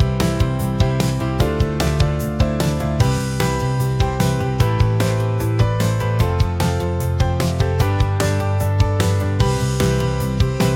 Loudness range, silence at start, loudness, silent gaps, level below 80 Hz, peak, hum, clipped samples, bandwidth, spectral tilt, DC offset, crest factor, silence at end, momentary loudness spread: 1 LU; 0 s; -19 LUFS; none; -28 dBFS; -4 dBFS; none; under 0.1%; 17 kHz; -6 dB/octave; under 0.1%; 14 dB; 0 s; 2 LU